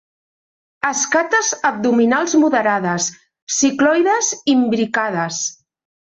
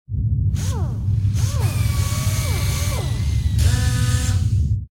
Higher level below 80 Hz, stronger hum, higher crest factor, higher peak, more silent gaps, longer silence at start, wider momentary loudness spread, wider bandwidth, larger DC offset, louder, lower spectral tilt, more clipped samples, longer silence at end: second, -64 dBFS vs -26 dBFS; neither; about the same, 14 dB vs 12 dB; about the same, -4 dBFS vs -6 dBFS; first, 3.42-3.47 s vs none; first, 0.85 s vs 0.1 s; first, 7 LU vs 4 LU; second, 8.2 kHz vs 17 kHz; neither; first, -17 LUFS vs -21 LUFS; second, -3 dB/octave vs -5 dB/octave; neither; first, 0.6 s vs 0.05 s